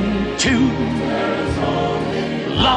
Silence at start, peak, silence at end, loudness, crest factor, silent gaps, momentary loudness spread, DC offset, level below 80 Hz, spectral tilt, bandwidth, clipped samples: 0 s; -2 dBFS; 0 s; -19 LUFS; 16 dB; none; 5 LU; under 0.1%; -34 dBFS; -5 dB/octave; 10.5 kHz; under 0.1%